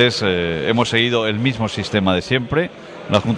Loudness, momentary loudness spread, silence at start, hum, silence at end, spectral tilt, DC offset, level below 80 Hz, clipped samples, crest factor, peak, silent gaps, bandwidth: -18 LUFS; 6 LU; 0 s; none; 0 s; -5.5 dB/octave; under 0.1%; -46 dBFS; under 0.1%; 16 dB; -2 dBFS; none; 11 kHz